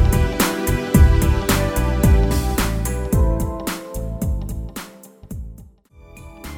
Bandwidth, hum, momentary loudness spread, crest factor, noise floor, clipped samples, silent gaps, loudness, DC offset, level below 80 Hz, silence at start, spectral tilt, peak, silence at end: over 20 kHz; none; 19 LU; 18 dB; -45 dBFS; under 0.1%; none; -19 LUFS; under 0.1%; -22 dBFS; 0 s; -5.5 dB/octave; -2 dBFS; 0 s